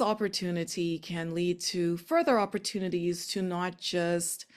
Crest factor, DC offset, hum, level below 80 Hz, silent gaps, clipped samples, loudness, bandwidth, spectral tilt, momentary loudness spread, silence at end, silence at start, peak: 16 dB; under 0.1%; none; -68 dBFS; none; under 0.1%; -30 LUFS; 14.5 kHz; -4.5 dB/octave; 6 LU; 0.15 s; 0 s; -14 dBFS